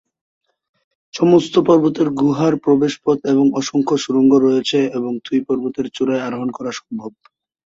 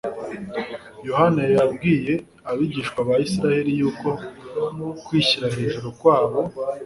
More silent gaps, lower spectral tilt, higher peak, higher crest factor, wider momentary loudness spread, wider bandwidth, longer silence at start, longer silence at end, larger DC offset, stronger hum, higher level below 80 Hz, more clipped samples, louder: neither; about the same, -6 dB/octave vs -6 dB/octave; about the same, -2 dBFS vs -2 dBFS; about the same, 16 dB vs 18 dB; about the same, 12 LU vs 12 LU; second, 7.8 kHz vs 11.5 kHz; first, 1.15 s vs 0.05 s; first, 0.55 s vs 0 s; neither; neither; second, -60 dBFS vs -54 dBFS; neither; first, -17 LUFS vs -22 LUFS